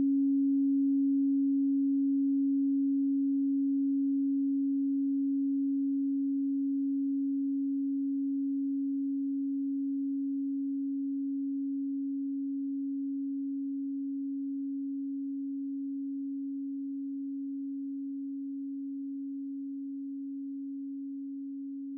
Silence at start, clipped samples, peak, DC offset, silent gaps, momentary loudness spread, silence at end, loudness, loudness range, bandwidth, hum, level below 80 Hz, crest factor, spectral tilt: 0 s; under 0.1%; -24 dBFS; under 0.1%; none; 11 LU; 0 s; -32 LUFS; 9 LU; 0.4 kHz; none; under -90 dBFS; 8 dB; -12.5 dB/octave